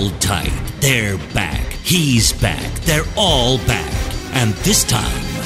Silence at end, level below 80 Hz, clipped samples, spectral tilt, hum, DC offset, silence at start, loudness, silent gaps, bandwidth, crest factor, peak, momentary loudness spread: 0 s; -26 dBFS; under 0.1%; -3.5 dB/octave; none; under 0.1%; 0 s; -16 LUFS; none; 16 kHz; 16 dB; 0 dBFS; 8 LU